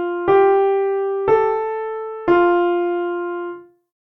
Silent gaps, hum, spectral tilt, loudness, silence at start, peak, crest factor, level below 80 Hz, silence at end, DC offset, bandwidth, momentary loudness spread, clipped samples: none; none; -8.5 dB/octave; -18 LUFS; 0 s; -4 dBFS; 14 dB; -56 dBFS; 0.55 s; under 0.1%; 3.8 kHz; 12 LU; under 0.1%